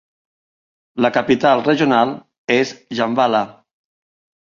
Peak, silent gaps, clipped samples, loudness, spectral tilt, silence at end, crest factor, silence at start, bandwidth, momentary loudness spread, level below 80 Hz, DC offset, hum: -2 dBFS; 2.38-2.48 s; under 0.1%; -17 LUFS; -5.5 dB/octave; 1 s; 18 dB; 0.95 s; 7.4 kHz; 9 LU; -60 dBFS; under 0.1%; none